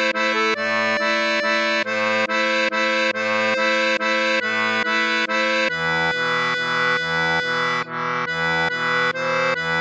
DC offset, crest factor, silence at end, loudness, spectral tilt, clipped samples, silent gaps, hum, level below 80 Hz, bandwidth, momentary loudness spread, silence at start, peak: under 0.1%; 12 dB; 0 s; -19 LUFS; -3 dB/octave; under 0.1%; none; none; -60 dBFS; 8.6 kHz; 2 LU; 0 s; -8 dBFS